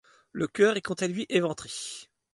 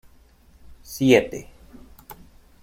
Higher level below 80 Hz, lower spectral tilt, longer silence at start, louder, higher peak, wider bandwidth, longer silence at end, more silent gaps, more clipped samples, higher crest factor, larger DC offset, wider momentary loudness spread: second, -68 dBFS vs -50 dBFS; about the same, -4.5 dB/octave vs -5.5 dB/octave; second, 0.35 s vs 0.7 s; second, -28 LUFS vs -20 LUFS; second, -10 dBFS vs -2 dBFS; second, 11.5 kHz vs 16.5 kHz; second, 0.3 s vs 0.5 s; neither; neither; about the same, 20 dB vs 22 dB; neither; second, 15 LU vs 27 LU